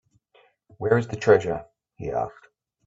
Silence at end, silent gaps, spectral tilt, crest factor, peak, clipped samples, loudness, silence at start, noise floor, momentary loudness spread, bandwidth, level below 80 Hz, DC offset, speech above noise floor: 0.55 s; none; -7 dB/octave; 22 dB; -4 dBFS; under 0.1%; -24 LUFS; 0.8 s; -61 dBFS; 14 LU; 7.8 kHz; -56 dBFS; under 0.1%; 39 dB